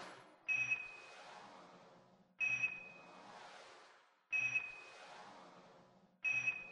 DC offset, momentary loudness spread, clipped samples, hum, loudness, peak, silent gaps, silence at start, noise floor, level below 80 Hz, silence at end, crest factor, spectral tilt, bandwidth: under 0.1%; 23 LU; under 0.1%; none; -38 LUFS; -28 dBFS; none; 0 s; -67 dBFS; -86 dBFS; 0 s; 16 dB; -2 dB/octave; 11 kHz